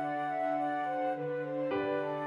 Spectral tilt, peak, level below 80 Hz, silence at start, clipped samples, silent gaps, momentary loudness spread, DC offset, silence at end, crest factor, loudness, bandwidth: -7.5 dB/octave; -22 dBFS; -74 dBFS; 0 s; under 0.1%; none; 3 LU; under 0.1%; 0 s; 12 dB; -34 LUFS; 10 kHz